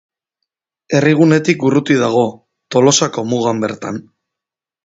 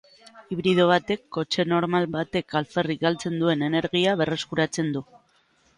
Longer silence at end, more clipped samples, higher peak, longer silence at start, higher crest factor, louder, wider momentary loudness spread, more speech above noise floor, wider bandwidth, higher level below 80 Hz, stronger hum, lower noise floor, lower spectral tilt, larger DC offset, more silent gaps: about the same, 0.85 s vs 0.75 s; neither; first, 0 dBFS vs -6 dBFS; first, 0.9 s vs 0.35 s; about the same, 16 dB vs 18 dB; first, -14 LUFS vs -24 LUFS; first, 10 LU vs 7 LU; first, 73 dB vs 40 dB; second, 8 kHz vs 11 kHz; about the same, -58 dBFS vs -60 dBFS; neither; first, -86 dBFS vs -63 dBFS; about the same, -5 dB/octave vs -5.5 dB/octave; neither; neither